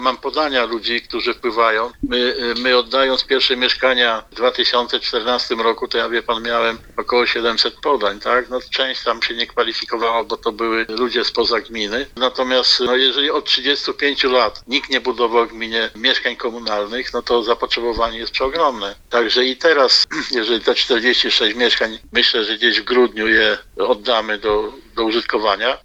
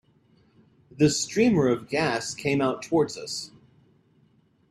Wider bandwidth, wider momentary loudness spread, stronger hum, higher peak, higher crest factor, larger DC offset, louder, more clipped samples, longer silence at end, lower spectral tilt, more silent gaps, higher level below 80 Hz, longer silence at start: second, 11.5 kHz vs 13.5 kHz; second, 7 LU vs 12 LU; neither; first, 0 dBFS vs -8 dBFS; about the same, 18 dB vs 20 dB; neither; first, -17 LUFS vs -25 LUFS; neither; second, 0.05 s vs 1.25 s; second, -2.5 dB/octave vs -4.5 dB/octave; neither; first, -46 dBFS vs -60 dBFS; second, 0 s vs 0.95 s